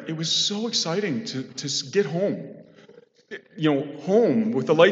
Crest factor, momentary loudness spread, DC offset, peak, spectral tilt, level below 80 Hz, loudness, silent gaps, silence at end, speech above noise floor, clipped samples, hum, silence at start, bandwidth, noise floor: 22 dB; 14 LU; under 0.1%; -2 dBFS; -4 dB/octave; -80 dBFS; -24 LUFS; none; 0 s; 29 dB; under 0.1%; none; 0 s; 8.2 kHz; -52 dBFS